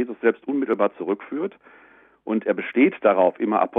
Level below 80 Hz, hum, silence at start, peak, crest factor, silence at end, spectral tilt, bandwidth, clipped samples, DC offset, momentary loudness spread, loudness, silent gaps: -74 dBFS; none; 0 s; -4 dBFS; 18 dB; 0 s; -9.5 dB/octave; 3.9 kHz; under 0.1%; under 0.1%; 11 LU; -22 LUFS; none